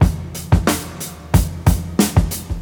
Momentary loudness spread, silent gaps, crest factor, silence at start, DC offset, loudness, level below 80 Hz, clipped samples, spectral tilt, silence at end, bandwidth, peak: 11 LU; none; 16 dB; 0 s; under 0.1%; -18 LUFS; -24 dBFS; under 0.1%; -5.5 dB/octave; 0 s; over 20 kHz; -2 dBFS